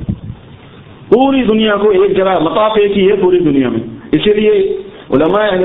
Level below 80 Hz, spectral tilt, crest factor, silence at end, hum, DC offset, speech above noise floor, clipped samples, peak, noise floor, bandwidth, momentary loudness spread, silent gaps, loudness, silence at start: -38 dBFS; -9.5 dB/octave; 12 dB; 0 s; none; under 0.1%; 25 dB; under 0.1%; 0 dBFS; -35 dBFS; 4 kHz; 8 LU; none; -11 LUFS; 0 s